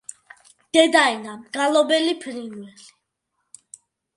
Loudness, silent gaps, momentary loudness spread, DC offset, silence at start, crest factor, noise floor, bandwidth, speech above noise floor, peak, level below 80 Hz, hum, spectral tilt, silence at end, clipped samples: -19 LUFS; none; 20 LU; under 0.1%; 0.75 s; 22 dB; -76 dBFS; 11.5 kHz; 56 dB; -2 dBFS; -74 dBFS; none; -2 dB/octave; 1.5 s; under 0.1%